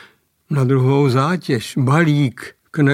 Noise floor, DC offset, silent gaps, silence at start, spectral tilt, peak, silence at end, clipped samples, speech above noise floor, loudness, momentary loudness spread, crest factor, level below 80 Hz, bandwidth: -50 dBFS; under 0.1%; none; 0.5 s; -7 dB/octave; 0 dBFS; 0 s; under 0.1%; 34 dB; -17 LUFS; 9 LU; 16 dB; -60 dBFS; 13.5 kHz